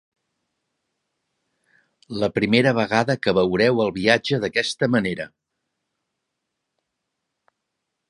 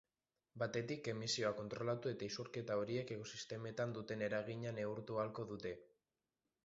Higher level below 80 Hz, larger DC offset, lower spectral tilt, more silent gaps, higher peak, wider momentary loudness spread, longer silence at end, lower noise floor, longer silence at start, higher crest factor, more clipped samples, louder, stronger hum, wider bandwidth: first, -56 dBFS vs -76 dBFS; neither; about the same, -5.5 dB/octave vs -4.5 dB/octave; neither; first, -2 dBFS vs -26 dBFS; about the same, 9 LU vs 7 LU; first, 2.85 s vs 0.8 s; second, -80 dBFS vs under -90 dBFS; first, 2.1 s vs 0.55 s; about the same, 22 dB vs 18 dB; neither; first, -20 LUFS vs -44 LUFS; neither; first, 11.5 kHz vs 7.6 kHz